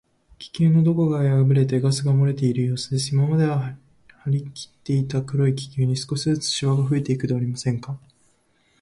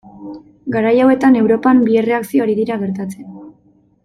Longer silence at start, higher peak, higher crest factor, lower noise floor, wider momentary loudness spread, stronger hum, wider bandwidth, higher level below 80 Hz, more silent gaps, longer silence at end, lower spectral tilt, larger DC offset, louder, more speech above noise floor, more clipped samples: first, 0.4 s vs 0.05 s; second, -8 dBFS vs -2 dBFS; about the same, 14 dB vs 14 dB; first, -63 dBFS vs -53 dBFS; second, 13 LU vs 22 LU; neither; second, 11.5 kHz vs 14 kHz; about the same, -56 dBFS vs -56 dBFS; neither; first, 0.85 s vs 0.55 s; about the same, -6.5 dB/octave vs -7.5 dB/octave; neither; second, -22 LUFS vs -14 LUFS; about the same, 42 dB vs 40 dB; neither